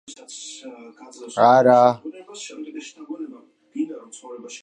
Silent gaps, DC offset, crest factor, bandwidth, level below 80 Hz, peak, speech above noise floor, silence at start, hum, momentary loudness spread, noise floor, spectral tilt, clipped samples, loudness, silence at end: none; under 0.1%; 20 dB; 10 kHz; -76 dBFS; -2 dBFS; 24 dB; 0.1 s; none; 24 LU; -45 dBFS; -5 dB/octave; under 0.1%; -18 LUFS; 0.05 s